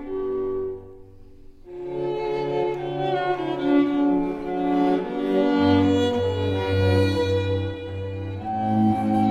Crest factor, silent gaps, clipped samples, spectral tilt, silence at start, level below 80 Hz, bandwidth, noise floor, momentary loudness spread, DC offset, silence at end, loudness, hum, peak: 16 dB; none; under 0.1%; -8 dB/octave; 0 s; -48 dBFS; 10 kHz; -44 dBFS; 11 LU; under 0.1%; 0 s; -23 LUFS; none; -8 dBFS